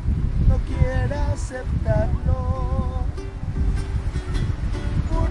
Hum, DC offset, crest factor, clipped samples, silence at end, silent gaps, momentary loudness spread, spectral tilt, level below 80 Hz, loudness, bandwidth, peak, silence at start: none; under 0.1%; 16 dB; under 0.1%; 0 s; none; 6 LU; -7.5 dB/octave; -24 dBFS; -24 LUFS; 11 kHz; -4 dBFS; 0 s